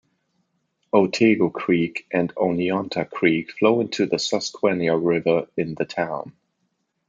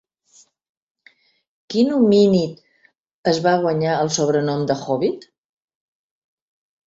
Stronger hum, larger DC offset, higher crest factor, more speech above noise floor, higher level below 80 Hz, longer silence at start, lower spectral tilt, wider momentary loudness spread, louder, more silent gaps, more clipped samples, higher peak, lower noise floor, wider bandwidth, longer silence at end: neither; neither; about the same, 20 dB vs 18 dB; first, 52 dB vs 43 dB; about the same, -64 dBFS vs -62 dBFS; second, 0.95 s vs 1.7 s; about the same, -5.5 dB/octave vs -5.5 dB/octave; about the same, 8 LU vs 10 LU; second, -22 LUFS vs -19 LUFS; second, none vs 3.00-3.04 s, 3.11-3.23 s; neither; about the same, -4 dBFS vs -4 dBFS; first, -73 dBFS vs -61 dBFS; about the same, 7.8 kHz vs 8 kHz; second, 0.8 s vs 1.7 s